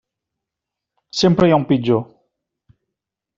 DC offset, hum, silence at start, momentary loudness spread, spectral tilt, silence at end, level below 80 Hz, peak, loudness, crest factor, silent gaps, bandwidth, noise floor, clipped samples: under 0.1%; none; 1.15 s; 12 LU; -6 dB/octave; 1.35 s; -52 dBFS; -2 dBFS; -16 LUFS; 18 dB; none; 7.6 kHz; -84 dBFS; under 0.1%